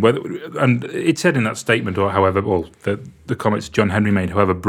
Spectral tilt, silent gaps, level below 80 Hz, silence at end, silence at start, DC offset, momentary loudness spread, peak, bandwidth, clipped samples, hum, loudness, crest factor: -6 dB/octave; none; -50 dBFS; 0 s; 0 s; under 0.1%; 8 LU; 0 dBFS; 16 kHz; under 0.1%; none; -19 LUFS; 18 dB